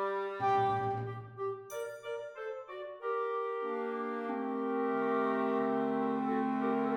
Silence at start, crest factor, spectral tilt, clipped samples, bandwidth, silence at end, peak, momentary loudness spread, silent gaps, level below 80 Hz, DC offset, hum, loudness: 0 s; 14 dB; -7 dB/octave; under 0.1%; 17 kHz; 0 s; -20 dBFS; 10 LU; none; -74 dBFS; under 0.1%; none; -35 LUFS